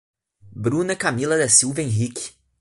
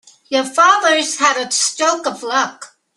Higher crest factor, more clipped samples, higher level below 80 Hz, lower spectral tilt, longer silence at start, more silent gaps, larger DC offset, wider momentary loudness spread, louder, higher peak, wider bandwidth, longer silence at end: about the same, 20 dB vs 16 dB; neither; first, -54 dBFS vs -72 dBFS; first, -3.5 dB/octave vs 0 dB/octave; first, 0.45 s vs 0.3 s; neither; neither; first, 13 LU vs 9 LU; second, -19 LUFS vs -15 LUFS; about the same, -2 dBFS vs 0 dBFS; about the same, 11.5 kHz vs 12.5 kHz; about the same, 0.3 s vs 0.3 s